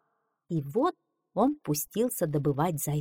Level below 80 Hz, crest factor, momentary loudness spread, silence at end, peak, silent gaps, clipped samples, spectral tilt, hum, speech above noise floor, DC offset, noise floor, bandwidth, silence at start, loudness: -60 dBFS; 16 dB; 6 LU; 0 s; -14 dBFS; none; under 0.1%; -6 dB/octave; none; 49 dB; under 0.1%; -77 dBFS; 18.5 kHz; 0.5 s; -29 LUFS